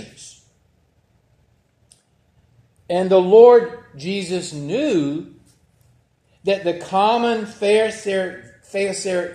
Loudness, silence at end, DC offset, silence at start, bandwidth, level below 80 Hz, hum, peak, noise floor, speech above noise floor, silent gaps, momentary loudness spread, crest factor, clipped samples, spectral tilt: -18 LUFS; 0 s; under 0.1%; 0 s; 10.5 kHz; -64 dBFS; none; 0 dBFS; -61 dBFS; 43 dB; none; 18 LU; 20 dB; under 0.1%; -5 dB/octave